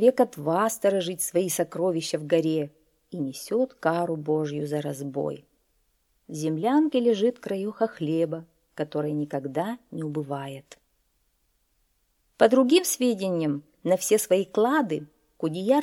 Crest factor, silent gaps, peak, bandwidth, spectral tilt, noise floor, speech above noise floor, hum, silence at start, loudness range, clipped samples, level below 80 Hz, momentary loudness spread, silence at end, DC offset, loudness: 20 dB; none; -6 dBFS; 17.5 kHz; -5 dB/octave; -71 dBFS; 46 dB; none; 0 s; 8 LU; under 0.1%; -72 dBFS; 12 LU; 0 s; under 0.1%; -26 LUFS